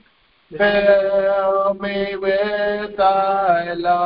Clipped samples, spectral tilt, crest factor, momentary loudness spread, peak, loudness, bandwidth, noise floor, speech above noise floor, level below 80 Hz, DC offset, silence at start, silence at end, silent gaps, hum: under 0.1%; -9.5 dB/octave; 14 dB; 7 LU; -4 dBFS; -18 LUFS; 5.4 kHz; -57 dBFS; 39 dB; -50 dBFS; under 0.1%; 0.5 s; 0 s; none; none